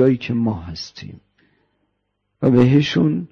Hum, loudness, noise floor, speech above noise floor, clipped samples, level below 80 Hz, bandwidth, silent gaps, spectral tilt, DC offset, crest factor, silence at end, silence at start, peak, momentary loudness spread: 50 Hz at -55 dBFS; -17 LUFS; -72 dBFS; 55 dB; under 0.1%; -48 dBFS; 7 kHz; none; -7.5 dB/octave; under 0.1%; 16 dB; 0.05 s; 0 s; -4 dBFS; 20 LU